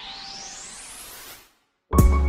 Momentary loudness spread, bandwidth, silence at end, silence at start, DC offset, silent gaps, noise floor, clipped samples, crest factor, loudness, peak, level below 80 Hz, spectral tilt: 21 LU; 16 kHz; 0 s; 0 s; under 0.1%; none; -60 dBFS; under 0.1%; 22 dB; -27 LUFS; -4 dBFS; -26 dBFS; -5.5 dB/octave